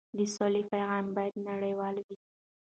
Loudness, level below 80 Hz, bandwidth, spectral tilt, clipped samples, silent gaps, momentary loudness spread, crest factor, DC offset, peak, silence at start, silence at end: -32 LUFS; -76 dBFS; 9 kHz; -5.5 dB/octave; under 0.1%; 2.04-2.09 s; 10 LU; 16 dB; under 0.1%; -16 dBFS; 0.15 s; 0.55 s